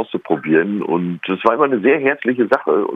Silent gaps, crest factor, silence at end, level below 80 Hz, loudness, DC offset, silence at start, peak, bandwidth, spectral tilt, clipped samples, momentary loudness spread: none; 16 dB; 0 s; -64 dBFS; -17 LUFS; under 0.1%; 0 s; 0 dBFS; 5.6 kHz; -8.5 dB/octave; under 0.1%; 6 LU